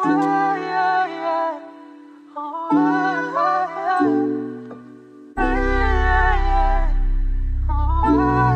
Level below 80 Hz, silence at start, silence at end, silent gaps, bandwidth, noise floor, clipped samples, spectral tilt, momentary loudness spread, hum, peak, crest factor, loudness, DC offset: -24 dBFS; 0 s; 0 s; none; 6.6 kHz; -43 dBFS; under 0.1%; -8 dB/octave; 14 LU; none; -6 dBFS; 14 dB; -20 LUFS; under 0.1%